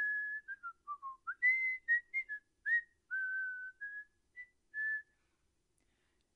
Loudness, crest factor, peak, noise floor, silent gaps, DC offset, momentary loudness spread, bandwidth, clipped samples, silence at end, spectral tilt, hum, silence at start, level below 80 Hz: -37 LUFS; 16 dB; -24 dBFS; -80 dBFS; none; under 0.1%; 16 LU; 10.5 kHz; under 0.1%; 1.35 s; -0.5 dB/octave; none; 0 s; -84 dBFS